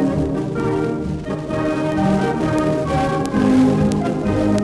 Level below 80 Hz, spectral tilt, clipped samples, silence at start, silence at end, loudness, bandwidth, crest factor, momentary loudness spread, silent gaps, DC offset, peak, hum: -38 dBFS; -7.5 dB/octave; under 0.1%; 0 s; 0 s; -19 LUFS; 12 kHz; 14 dB; 7 LU; none; under 0.1%; -4 dBFS; none